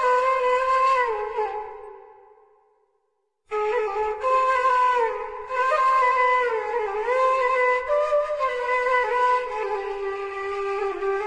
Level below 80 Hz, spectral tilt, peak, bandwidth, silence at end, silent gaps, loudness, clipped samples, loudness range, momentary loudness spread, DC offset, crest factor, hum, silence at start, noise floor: -56 dBFS; -2.5 dB/octave; -10 dBFS; 10 kHz; 0 s; none; -23 LUFS; under 0.1%; 6 LU; 10 LU; under 0.1%; 12 dB; none; 0 s; -73 dBFS